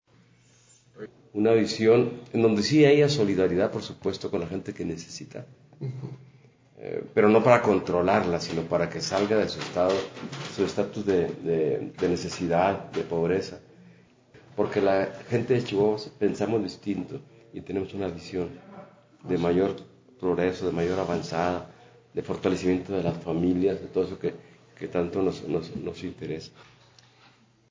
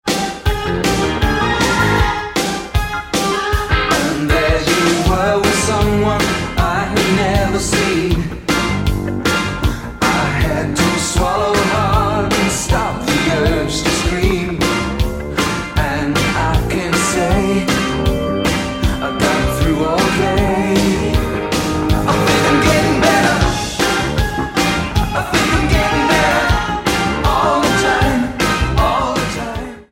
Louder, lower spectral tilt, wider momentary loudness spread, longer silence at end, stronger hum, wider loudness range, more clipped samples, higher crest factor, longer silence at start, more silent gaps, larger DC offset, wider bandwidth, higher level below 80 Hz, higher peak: second, -26 LUFS vs -15 LUFS; first, -6 dB/octave vs -4.5 dB/octave; first, 17 LU vs 5 LU; first, 1.1 s vs 0.1 s; neither; first, 8 LU vs 2 LU; neither; first, 22 dB vs 14 dB; first, 0.95 s vs 0.05 s; neither; neither; second, 7.6 kHz vs 17 kHz; second, -54 dBFS vs -24 dBFS; second, -4 dBFS vs 0 dBFS